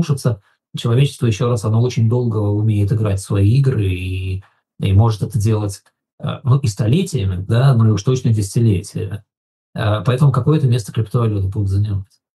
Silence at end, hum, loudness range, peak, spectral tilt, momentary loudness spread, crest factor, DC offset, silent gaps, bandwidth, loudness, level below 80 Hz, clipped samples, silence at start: 0.3 s; none; 2 LU; -2 dBFS; -7.5 dB/octave; 12 LU; 14 dB; under 0.1%; 6.13-6.18 s, 9.37-9.73 s; 12.5 kHz; -17 LUFS; -50 dBFS; under 0.1%; 0 s